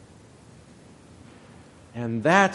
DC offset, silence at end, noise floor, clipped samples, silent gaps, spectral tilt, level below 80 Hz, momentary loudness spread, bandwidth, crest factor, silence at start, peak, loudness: under 0.1%; 0 s; -50 dBFS; under 0.1%; none; -5 dB/octave; -62 dBFS; 29 LU; 11.5 kHz; 24 dB; 1.95 s; -4 dBFS; -23 LUFS